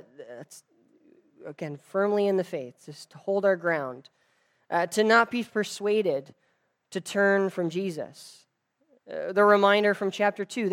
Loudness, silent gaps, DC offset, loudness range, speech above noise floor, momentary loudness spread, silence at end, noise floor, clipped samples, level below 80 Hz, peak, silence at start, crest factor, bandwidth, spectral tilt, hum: -25 LUFS; none; under 0.1%; 5 LU; 46 dB; 23 LU; 0 s; -72 dBFS; under 0.1%; -86 dBFS; -6 dBFS; 0.2 s; 20 dB; 15.5 kHz; -5 dB/octave; none